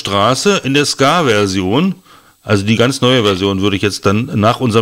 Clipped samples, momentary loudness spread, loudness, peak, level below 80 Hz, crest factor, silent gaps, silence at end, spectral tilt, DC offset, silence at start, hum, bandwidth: under 0.1%; 5 LU; -13 LUFS; 0 dBFS; -48 dBFS; 12 dB; none; 0 s; -5 dB/octave; under 0.1%; 0 s; none; 16 kHz